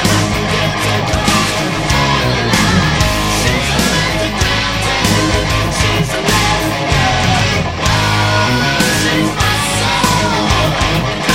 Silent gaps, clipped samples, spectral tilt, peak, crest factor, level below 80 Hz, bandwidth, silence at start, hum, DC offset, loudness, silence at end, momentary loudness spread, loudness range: none; under 0.1%; -4 dB/octave; 0 dBFS; 14 dB; -26 dBFS; 16.5 kHz; 0 s; none; 0.4%; -13 LUFS; 0 s; 3 LU; 1 LU